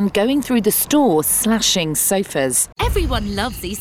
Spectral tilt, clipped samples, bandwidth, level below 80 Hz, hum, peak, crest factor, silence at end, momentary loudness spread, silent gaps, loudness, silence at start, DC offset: -3.5 dB/octave; under 0.1%; 17.5 kHz; -30 dBFS; none; -6 dBFS; 12 dB; 0 s; 6 LU; none; -17 LUFS; 0 s; under 0.1%